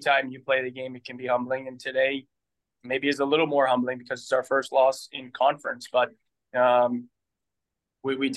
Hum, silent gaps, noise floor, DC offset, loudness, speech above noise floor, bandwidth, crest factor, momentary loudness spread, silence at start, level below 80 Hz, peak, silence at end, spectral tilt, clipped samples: none; none; -86 dBFS; under 0.1%; -26 LUFS; 61 dB; 12.5 kHz; 18 dB; 13 LU; 0 s; -82 dBFS; -8 dBFS; 0 s; -4.5 dB/octave; under 0.1%